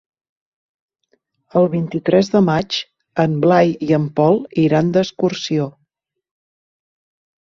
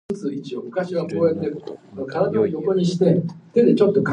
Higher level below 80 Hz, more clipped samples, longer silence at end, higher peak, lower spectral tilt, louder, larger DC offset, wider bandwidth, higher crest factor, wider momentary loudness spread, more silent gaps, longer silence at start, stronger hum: about the same, -56 dBFS vs -60 dBFS; neither; first, 1.9 s vs 0 s; about the same, -2 dBFS vs -4 dBFS; about the same, -7 dB/octave vs -8 dB/octave; first, -17 LUFS vs -21 LUFS; neither; second, 7.4 kHz vs 9.6 kHz; about the same, 16 dB vs 16 dB; second, 8 LU vs 12 LU; neither; first, 1.55 s vs 0.1 s; neither